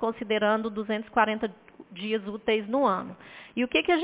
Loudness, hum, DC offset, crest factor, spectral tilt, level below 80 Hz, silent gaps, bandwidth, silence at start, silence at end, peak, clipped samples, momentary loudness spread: -27 LUFS; none; under 0.1%; 18 dB; -8.5 dB/octave; -62 dBFS; none; 4 kHz; 0 s; 0 s; -8 dBFS; under 0.1%; 12 LU